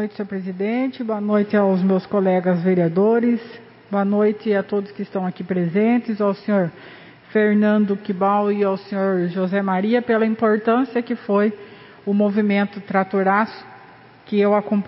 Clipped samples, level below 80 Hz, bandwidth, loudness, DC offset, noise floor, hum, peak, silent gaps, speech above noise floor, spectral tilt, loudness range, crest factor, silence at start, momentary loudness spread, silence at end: under 0.1%; -68 dBFS; 5.8 kHz; -20 LUFS; under 0.1%; -46 dBFS; none; -4 dBFS; none; 26 dB; -12.5 dB/octave; 2 LU; 16 dB; 0 s; 8 LU; 0 s